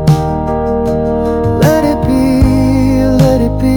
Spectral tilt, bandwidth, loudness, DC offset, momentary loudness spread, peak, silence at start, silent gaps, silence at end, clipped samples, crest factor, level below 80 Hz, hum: -7.5 dB/octave; 19.5 kHz; -11 LUFS; under 0.1%; 4 LU; 0 dBFS; 0 s; none; 0 s; 0.6%; 10 dB; -20 dBFS; none